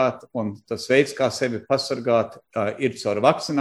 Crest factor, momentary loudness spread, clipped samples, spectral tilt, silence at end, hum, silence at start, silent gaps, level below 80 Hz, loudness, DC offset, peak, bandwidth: 20 dB; 10 LU; under 0.1%; -5 dB/octave; 0 s; none; 0 s; none; -64 dBFS; -23 LUFS; under 0.1%; -2 dBFS; 13 kHz